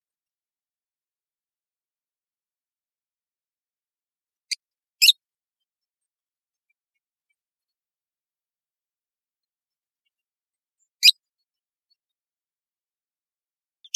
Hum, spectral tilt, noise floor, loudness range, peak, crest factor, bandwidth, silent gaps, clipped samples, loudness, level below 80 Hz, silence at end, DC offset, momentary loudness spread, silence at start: none; 13 dB/octave; under -90 dBFS; 0 LU; -2 dBFS; 28 dB; 8.4 kHz; 7.51-7.55 s; under 0.1%; -16 LUFS; under -90 dBFS; 2.85 s; under 0.1%; 16 LU; 4.5 s